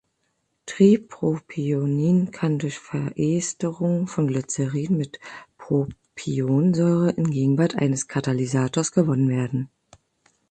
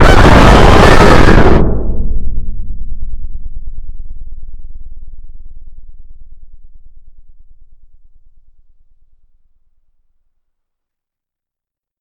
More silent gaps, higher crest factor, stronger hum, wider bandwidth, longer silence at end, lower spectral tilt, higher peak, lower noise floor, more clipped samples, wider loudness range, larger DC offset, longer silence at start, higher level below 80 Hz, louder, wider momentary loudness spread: neither; first, 18 dB vs 10 dB; neither; second, 9.2 kHz vs 11 kHz; second, 0.85 s vs 4.05 s; about the same, -6.5 dB/octave vs -6 dB/octave; second, -4 dBFS vs 0 dBFS; second, -73 dBFS vs -85 dBFS; second, under 0.1% vs 2%; second, 4 LU vs 28 LU; neither; first, 0.65 s vs 0 s; second, -60 dBFS vs -16 dBFS; second, -23 LUFS vs -8 LUFS; second, 10 LU vs 28 LU